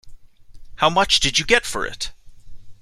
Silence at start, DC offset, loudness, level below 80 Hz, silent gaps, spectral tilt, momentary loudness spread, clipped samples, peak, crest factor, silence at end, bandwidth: 0.05 s; under 0.1%; -18 LUFS; -40 dBFS; none; -2 dB/octave; 13 LU; under 0.1%; 0 dBFS; 22 dB; 0.1 s; 14.5 kHz